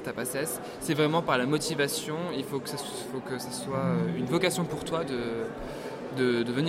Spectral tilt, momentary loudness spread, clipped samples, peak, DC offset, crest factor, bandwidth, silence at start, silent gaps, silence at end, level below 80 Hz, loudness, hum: -4.5 dB/octave; 9 LU; under 0.1%; -10 dBFS; under 0.1%; 20 dB; 16.5 kHz; 0 s; none; 0 s; -58 dBFS; -30 LUFS; none